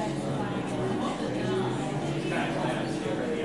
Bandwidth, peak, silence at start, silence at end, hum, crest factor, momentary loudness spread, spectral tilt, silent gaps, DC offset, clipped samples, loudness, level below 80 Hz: 11.5 kHz; -16 dBFS; 0 s; 0 s; none; 12 dB; 2 LU; -6 dB/octave; none; 0.2%; under 0.1%; -30 LUFS; -56 dBFS